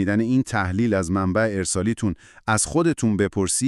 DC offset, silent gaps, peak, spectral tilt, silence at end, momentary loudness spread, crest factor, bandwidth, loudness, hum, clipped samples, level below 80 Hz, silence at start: under 0.1%; none; -6 dBFS; -5 dB/octave; 0 s; 4 LU; 16 dB; 13.5 kHz; -22 LUFS; none; under 0.1%; -46 dBFS; 0 s